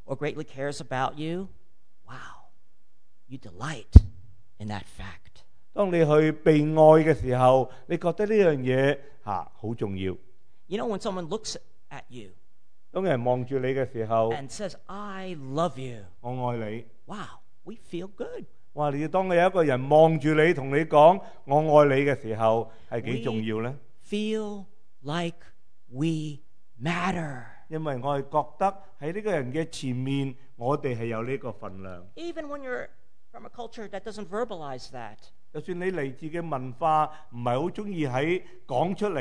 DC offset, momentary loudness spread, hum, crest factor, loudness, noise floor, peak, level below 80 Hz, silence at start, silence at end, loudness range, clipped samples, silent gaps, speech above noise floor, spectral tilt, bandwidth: 1%; 22 LU; none; 26 dB; -26 LUFS; -69 dBFS; 0 dBFS; -38 dBFS; 0.1 s; 0 s; 14 LU; under 0.1%; none; 44 dB; -7 dB/octave; 10.5 kHz